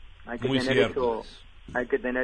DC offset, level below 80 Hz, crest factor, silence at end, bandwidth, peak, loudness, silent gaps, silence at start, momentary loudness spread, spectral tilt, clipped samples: under 0.1%; -48 dBFS; 20 dB; 0 s; 10.5 kHz; -8 dBFS; -27 LUFS; none; 0 s; 13 LU; -5.5 dB/octave; under 0.1%